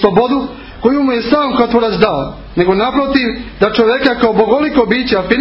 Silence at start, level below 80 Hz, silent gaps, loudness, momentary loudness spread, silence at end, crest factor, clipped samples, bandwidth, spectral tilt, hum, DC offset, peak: 0 s; -36 dBFS; none; -13 LUFS; 6 LU; 0 s; 12 dB; 0.1%; 5.8 kHz; -8 dB/octave; none; under 0.1%; 0 dBFS